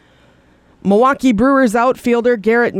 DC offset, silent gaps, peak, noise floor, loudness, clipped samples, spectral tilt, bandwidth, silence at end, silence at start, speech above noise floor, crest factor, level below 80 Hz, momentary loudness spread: under 0.1%; none; -2 dBFS; -50 dBFS; -13 LUFS; under 0.1%; -6.5 dB/octave; 14.5 kHz; 0 s; 0.85 s; 37 dB; 12 dB; -44 dBFS; 3 LU